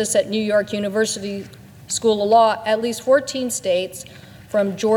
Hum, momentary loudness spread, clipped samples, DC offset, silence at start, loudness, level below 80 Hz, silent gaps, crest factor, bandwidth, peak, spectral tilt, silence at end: none; 15 LU; under 0.1%; under 0.1%; 0 s; -20 LUFS; -60 dBFS; none; 16 dB; 19 kHz; -4 dBFS; -3.5 dB/octave; 0 s